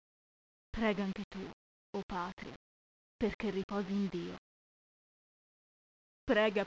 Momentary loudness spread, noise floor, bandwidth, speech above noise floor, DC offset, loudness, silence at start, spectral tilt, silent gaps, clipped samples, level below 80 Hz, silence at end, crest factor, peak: 15 LU; under -90 dBFS; 7.8 kHz; over 54 dB; under 0.1%; -37 LUFS; 0.75 s; -6.5 dB/octave; 1.24-1.31 s, 1.53-1.93 s, 2.03-2.09 s, 2.33-2.37 s, 2.56-3.19 s, 3.34-3.39 s, 3.64-3.69 s, 4.38-6.27 s; under 0.1%; -60 dBFS; 0 s; 22 dB; -18 dBFS